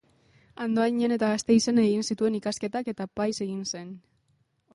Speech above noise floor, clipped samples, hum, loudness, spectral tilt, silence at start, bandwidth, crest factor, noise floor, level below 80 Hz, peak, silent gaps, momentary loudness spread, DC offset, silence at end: 44 dB; under 0.1%; none; -26 LUFS; -5 dB/octave; 0.6 s; 11.5 kHz; 16 dB; -70 dBFS; -66 dBFS; -10 dBFS; none; 12 LU; under 0.1%; 0.75 s